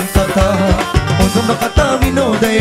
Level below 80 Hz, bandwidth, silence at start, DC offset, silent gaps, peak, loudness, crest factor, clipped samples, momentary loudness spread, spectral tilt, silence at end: -20 dBFS; 16.5 kHz; 0 s; under 0.1%; none; 0 dBFS; -13 LUFS; 12 dB; under 0.1%; 2 LU; -5.5 dB/octave; 0 s